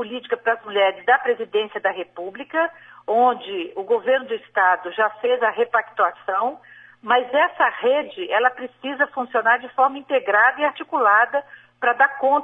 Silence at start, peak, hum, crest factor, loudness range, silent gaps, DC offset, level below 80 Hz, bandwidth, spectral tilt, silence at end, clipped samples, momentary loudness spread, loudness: 0 s; -4 dBFS; none; 18 dB; 3 LU; none; under 0.1%; -74 dBFS; 3.9 kHz; -4.5 dB/octave; 0 s; under 0.1%; 10 LU; -20 LUFS